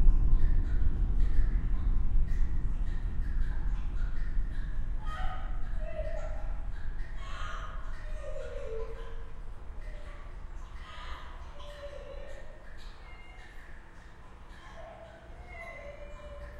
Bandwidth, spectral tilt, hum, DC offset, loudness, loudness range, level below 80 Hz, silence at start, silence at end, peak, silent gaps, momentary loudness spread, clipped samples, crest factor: 4.3 kHz; -7 dB/octave; none; under 0.1%; -38 LUFS; 14 LU; -30 dBFS; 0 s; 0 s; -10 dBFS; none; 17 LU; under 0.1%; 20 dB